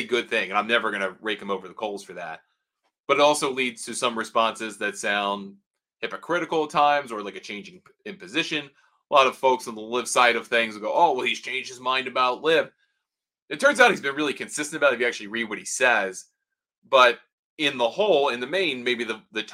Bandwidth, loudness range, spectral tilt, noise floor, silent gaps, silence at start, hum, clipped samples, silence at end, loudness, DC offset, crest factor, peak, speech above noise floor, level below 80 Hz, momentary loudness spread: 16 kHz; 4 LU; -2.5 dB/octave; -87 dBFS; 3.00-3.04 s, 5.66-5.71 s, 13.42-13.46 s, 16.78-16.82 s, 17.32-17.57 s; 0 s; none; under 0.1%; 0 s; -23 LUFS; under 0.1%; 24 dB; -2 dBFS; 63 dB; -76 dBFS; 15 LU